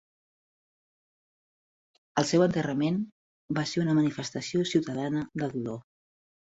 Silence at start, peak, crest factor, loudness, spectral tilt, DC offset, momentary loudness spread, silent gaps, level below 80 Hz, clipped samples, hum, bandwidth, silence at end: 2.15 s; -10 dBFS; 20 dB; -29 LUFS; -6 dB/octave; under 0.1%; 10 LU; 3.12-3.48 s; -66 dBFS; under 0.1%; none; 8.2 kHz; 0.75 s